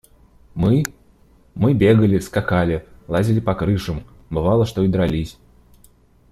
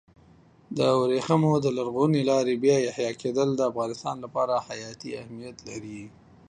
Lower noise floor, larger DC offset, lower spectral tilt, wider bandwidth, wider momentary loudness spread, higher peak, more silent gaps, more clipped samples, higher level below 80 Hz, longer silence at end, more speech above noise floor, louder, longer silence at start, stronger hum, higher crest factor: second, -52 dBFS vs -56 dBFS; neither; first, -7.5 dB/octave vs -6 dB/octave; first, 15 kHz vs 10 kHz; about the same, 14 LU vs 16 LU; first, -2 dBFS vs -8 dBFS; neither; neither; first, -40 dBFS vs -64 dBFS; first, 1 s vs 0.4 s; first, 35 dB vs 30 dB; first, -19 LUFS vs -25 LUFS; second, 0.55 s vs 0.7 s; neither; about the same, 16 dB vs 18 dB